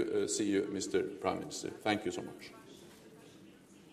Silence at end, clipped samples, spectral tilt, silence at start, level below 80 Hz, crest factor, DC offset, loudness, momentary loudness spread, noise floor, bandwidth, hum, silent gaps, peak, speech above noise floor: 0 s; under 0.1%; -4 dB/octave; 0 s; -74 dBFS; 22 dB; under 0.1%; -35 LUFS; 23 LU; -58 dBFS; 15.5 kHz; none; none; -14 dBFS; 22 dB